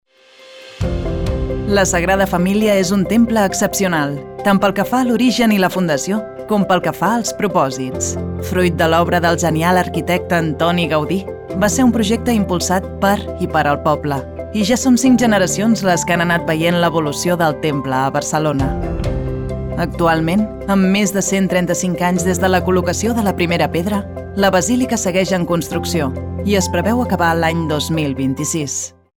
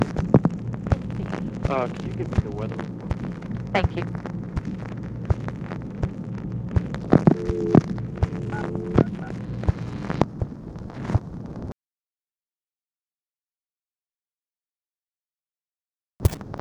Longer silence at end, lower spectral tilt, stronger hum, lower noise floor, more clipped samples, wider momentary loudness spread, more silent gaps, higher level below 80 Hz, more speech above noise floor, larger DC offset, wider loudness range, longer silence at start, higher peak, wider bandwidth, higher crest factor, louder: first, 0.3 s vs 0 s; second, -5 dB/octave vs -8.5 dB/octave; neither; second, -44 dBFS vs under -90 dBFS; neither; second, 7 LU vs 13 LU; second, none vs 14.98-15.02 s, 15.40-15.44 s; about the same, -34 dBFS vs -38 dBFS; second, 29 dB vs over 64 dB; neither; second, 2 LU vs 12 LU; first, 0.4 s vs 0 s; second, -4 dBFS vs 0 dBFS; about the same, 19.5 kHz vs over 20 kHz; second, 12 dB vs 26 dB; first, -16 LUFS vs -26 LUFS